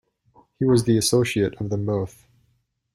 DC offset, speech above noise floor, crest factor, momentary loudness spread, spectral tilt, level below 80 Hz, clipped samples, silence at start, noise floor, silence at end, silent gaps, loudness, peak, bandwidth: under 0.1%; 47 dB; 16 dB; 9 LU; -5.5 dB/octave; -52 dBFS; under 0.1%; 0.6 s; -68 dBFS; 0.85 s; none; -22 LUFS; -8 dBFS; 14 kHz